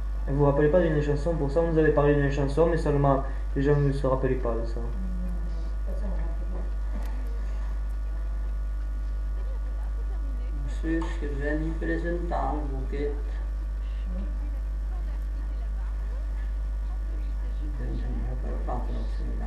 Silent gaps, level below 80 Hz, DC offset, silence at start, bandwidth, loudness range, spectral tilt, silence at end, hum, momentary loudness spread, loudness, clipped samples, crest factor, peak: none; -30 dBFS; under 0.1%; 0 s; 7.2 kHz; 9 LU; -8.5 dB/octave; 0 s; 50 Hz at -30 dBFS; 10 LU; -29 LUFS; under 0.1%; 18 dB; -8 dBFS